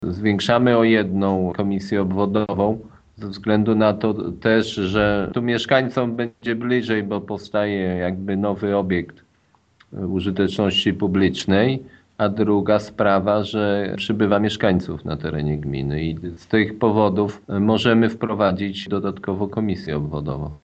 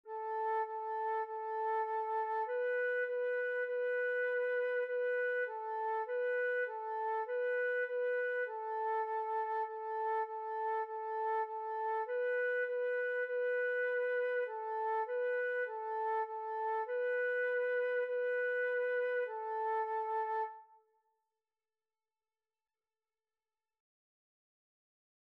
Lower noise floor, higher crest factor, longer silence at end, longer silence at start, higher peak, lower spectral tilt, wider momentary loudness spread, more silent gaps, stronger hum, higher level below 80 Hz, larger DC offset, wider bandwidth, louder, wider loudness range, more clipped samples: second, -60 dBFS vs under -90 dBFS; first, 20 dB vs 10 dB; second, 0.05 s vs 4.65 s; about the same, 0 s vs 0.05 s; first, 0 dBFS vs -28 dBFS; first, -7 dB/octave vs -1 dB/octave; first, 9 LU vs 4 LU; neither; neither; first, -48 dBFS vs under -90 dBFS; neither; first, 8.4 kHz vs 4.7 kHz; first, -21 LUFS vs -36 LUFS; about the same, 3 LU vs 2 LU; neither